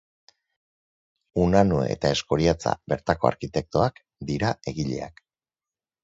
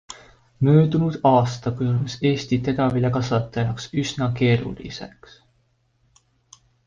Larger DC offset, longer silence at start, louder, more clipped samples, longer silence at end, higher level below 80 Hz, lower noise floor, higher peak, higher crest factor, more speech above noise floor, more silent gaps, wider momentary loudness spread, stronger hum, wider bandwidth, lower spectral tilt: neither; first, 1.35 s vs 0.1 s; second, -25 LUFS vs -21 LUFS; neither; second, 0.95 s vs 1.8 s; first, -44 dBFS vs -50 dBFS; first, under -90 dBFS vs -65 dBFS; about the same, -4 dBFS vs -4 dBFS; about the same, 22 dB vs 18 dB; first, over 66 dB vs 45 dB; neither; second, 11 LU vs 17 LU; neither; about the same, 8 kHz vs 7.6 kHz; about the same, -6 dB/octave vs -7 dB/octave